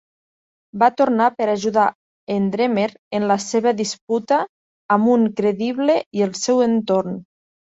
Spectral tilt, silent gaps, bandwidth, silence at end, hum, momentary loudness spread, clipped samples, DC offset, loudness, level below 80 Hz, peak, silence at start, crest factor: -5 dB/octave; 1.95-2.27 s, 2.99-3.11 s, 4.01-4.08 s, 4.49-4.89 s, 6.06-6.11 s; 8 kHz; 0.45 s; none; 7 LU; under 0.1%; under 0.1%; -19 LUFS; -64 dBFS; -2 dBFS; 0.75 s; 18 dB